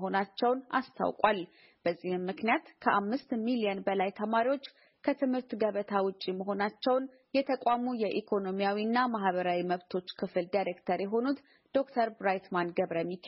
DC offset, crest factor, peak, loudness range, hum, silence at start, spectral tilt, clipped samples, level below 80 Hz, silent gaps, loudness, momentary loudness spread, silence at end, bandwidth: under 0.1%; 20 dB; -10 dBFS; 2 LU; none; 0 s; -4 dB/octave; under 0.1%; -76 dBFS; none; -32 LUFS; 6 LU; 0 s; 5.8 kHz